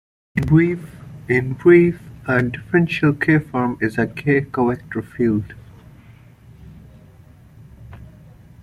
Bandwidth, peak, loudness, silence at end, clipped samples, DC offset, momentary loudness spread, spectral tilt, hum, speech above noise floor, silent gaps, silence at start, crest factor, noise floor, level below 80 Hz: 11.5 kHz; -2 dBFS; -18 LUFS; 0.6 s; under 0.1%; under 0.1%; 15 LU; -8.5 dB/octave; none; 28 dB; none; 0.35 s; 18 dB; -46 dBFS; -46 dBFS